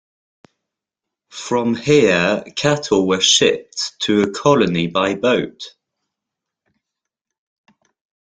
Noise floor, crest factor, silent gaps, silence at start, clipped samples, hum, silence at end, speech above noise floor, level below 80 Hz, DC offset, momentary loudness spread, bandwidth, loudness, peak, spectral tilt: -84 dBFS; 18 dB; none; 1.35 s; under 0.1%; none; 2.55 s; 67 dB; -56 dBFS; under 0.1%; 14 LU; 9.6 kHz; -16 LUFS; -2 dBFS; -3.5 dB/octave